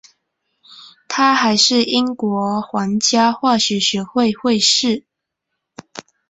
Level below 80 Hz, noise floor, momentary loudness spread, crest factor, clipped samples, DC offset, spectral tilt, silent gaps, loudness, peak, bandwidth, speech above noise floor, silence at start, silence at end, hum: -60 dBFS; -78 dBFS; 10 LU; 16 dB; under 0.1%; under 0.1%; -3 dB/octave; none; -16 LUFS; -2 dBFS; 8.4 kHz; 62 dB; 0.7 s; 0.3 s; none